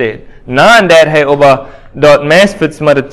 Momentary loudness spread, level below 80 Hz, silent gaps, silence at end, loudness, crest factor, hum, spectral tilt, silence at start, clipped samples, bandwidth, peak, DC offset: 9 LU; -38 dBFS; none; 0 s; -7 LUFS; 8 dB; none; -5 dB/octave; 0 s; 5%; 16 kHz; 0 dBFS; under 0.1%